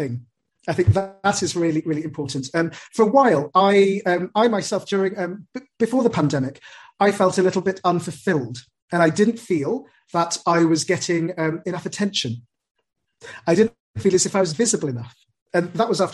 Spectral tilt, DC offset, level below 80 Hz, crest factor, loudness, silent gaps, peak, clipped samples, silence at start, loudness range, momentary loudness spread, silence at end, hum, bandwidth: -5 dB/octave; under 0.1%; -54 dBFS; 18 dB; -21 LUFS; 8.82-8.88 s, 12.71-12.75 s, 13.80-13.94 s, 15.42-15.46 s; -2 dBFS; under 0.1%; 0 s; 4 LU; 12 LU; 0 s; none; 12 kHz